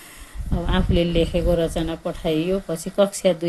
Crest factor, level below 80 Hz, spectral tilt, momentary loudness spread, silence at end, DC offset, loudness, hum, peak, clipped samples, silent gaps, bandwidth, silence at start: 16 dB; -30 dBFS; -6 dB/octave; 8 LU; 0 s; 0.1%; -22 LUFS; none; -6 dBFS; under 0.1%; none; 12.5 kHz; 0 s